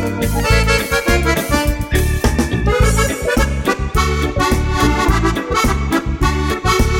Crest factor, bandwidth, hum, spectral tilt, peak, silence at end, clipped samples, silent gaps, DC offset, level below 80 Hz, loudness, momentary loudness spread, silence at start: 14 dB; 17 kHz; none; -5 dB/octave; 0 dBFS; 0 s; under 0.1%; none; under 0.1%; -20 dBFS; -16 LUFS; 3 LU; 0 s